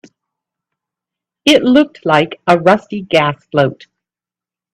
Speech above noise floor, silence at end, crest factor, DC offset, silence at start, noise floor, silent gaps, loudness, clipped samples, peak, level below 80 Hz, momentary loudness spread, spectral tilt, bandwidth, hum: 77 dB; 1 s; 16 dB; under 0.1%; 1.45 s; -89 dBFS; none; -13 LUFS; under 0.1%; 0 dBFS; -56 dBFS; 6 LU; -5.5 dB/octave; 13.5 kHz; none